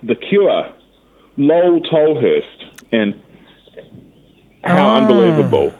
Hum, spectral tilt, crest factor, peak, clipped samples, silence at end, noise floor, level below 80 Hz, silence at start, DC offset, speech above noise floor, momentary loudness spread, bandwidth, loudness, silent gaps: none; -8 dB/octave; 14 dB; 0 dBFS; under 0.1%; 0.05 s; -50 dBFS; -56 dBFS; 0.05 s; under 0.1%; 38 dB; 15 LU; 11.5 kHz; -13 LUFS; none